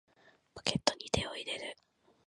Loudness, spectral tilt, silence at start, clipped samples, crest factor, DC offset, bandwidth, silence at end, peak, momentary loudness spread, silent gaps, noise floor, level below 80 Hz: -35 LUFS; -3 dB/octave; 0.25 s; under 0.1%; 32 dB; under 0.1%; 11.5 kHz; 0.55 s; -6 dBFS; 18 LU; none; -58 dBFS; -56 dBFS